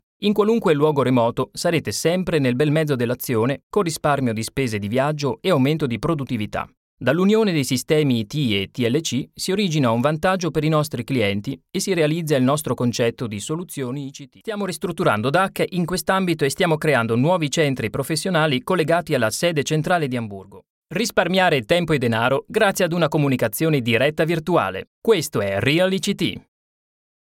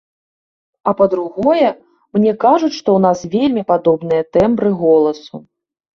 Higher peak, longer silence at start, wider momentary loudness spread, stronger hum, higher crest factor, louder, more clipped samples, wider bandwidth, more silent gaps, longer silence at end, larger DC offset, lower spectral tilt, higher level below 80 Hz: about the same, -2 dBFS vs 0 dBFS; second, 0.2 s vs 0.85 s; about the same, 8 LU vs 8 LU; neither; about the same, 18 dB vs 14 dB; second, -20 LUFS vs -15 LUFS; neither; first, 17 kHz vs 7.2 kHz; first, 3.63-3.70 s, 6.77-6.97 s, 20.70-20.82 s, 24.87-25.02 s vs none; first, 0.85 s vs 0.55 s; neither; second, -5 dB/octave vs -7 dB/octave; about the same, -52 dBFS vs -52 dBFS